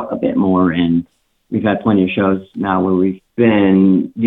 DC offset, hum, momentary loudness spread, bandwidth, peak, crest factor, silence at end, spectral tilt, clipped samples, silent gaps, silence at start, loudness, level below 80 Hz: under 0.1%; none; 8 LU; 4 kHz; 0 dBFS; 14 dB; 0 s; -10 dB/octave; under 0.1%; none; 0 s; -15 LUFS; -50 dBFS